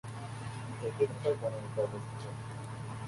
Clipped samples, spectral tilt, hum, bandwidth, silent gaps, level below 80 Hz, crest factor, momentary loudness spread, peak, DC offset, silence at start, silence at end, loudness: under 0.1%; -6.5 dB/octave; none; 11.5 kHz; none; -62 dBFS; 20 dB; 10 LU; -18 dBFS; under 0.1%; 0.05 s; 0 s; -37 LUFS